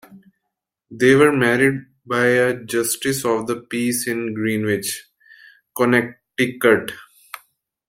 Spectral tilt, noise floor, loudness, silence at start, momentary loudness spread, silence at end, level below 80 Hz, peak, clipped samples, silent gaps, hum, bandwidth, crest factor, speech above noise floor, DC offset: -4.5 dB/octave; -80 dBFS; -19 LUFS; 0.1 s; 18 LU; 0.5 s; -60 dBFS; -2 dBFS; under 0.1%; none; none; 16.5 kHz; 18 dB; 61 dB; under 0.1%